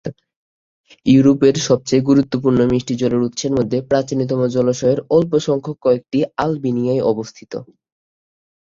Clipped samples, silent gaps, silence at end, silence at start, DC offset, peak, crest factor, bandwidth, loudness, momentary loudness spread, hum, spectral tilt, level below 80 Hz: under 0.1%; 0.36-0.84 s; 1 s; 0.05 s; under 0.1%; -2 dBFS; 16 dB; 7.6 kHz; -17 LUFS; 8 LU; none; -6.5 dB/octave; -50 dBFS